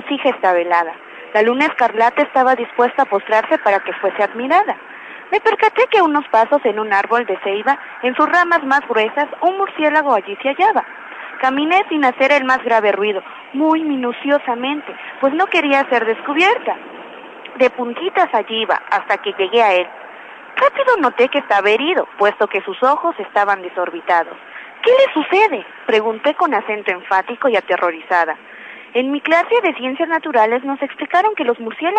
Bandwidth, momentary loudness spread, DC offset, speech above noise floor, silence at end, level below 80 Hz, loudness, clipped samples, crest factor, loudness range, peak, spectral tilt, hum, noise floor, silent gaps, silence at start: 9 kHz; 9 LU; under 0.1%; 20 dB; 0 s; -70 dBFS; -16 LUFS; under 0.1%; 14 dB; 2 LU; -2 dBFS; -4 dB/octave; none; -36 dBFS; none; 0 s